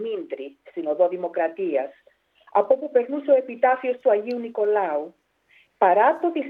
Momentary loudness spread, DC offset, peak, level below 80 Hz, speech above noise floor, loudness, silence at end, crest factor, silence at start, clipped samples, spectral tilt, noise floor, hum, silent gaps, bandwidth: 13 LU; under 0.1%; -6 dBFS; -78 dBFS; 38 dB; -22 LUFS; 0 s; 18 dB; 0 s; under 0.1%; -7.5 dB/octave; -60 dBFS; none; none; 4.8 kHz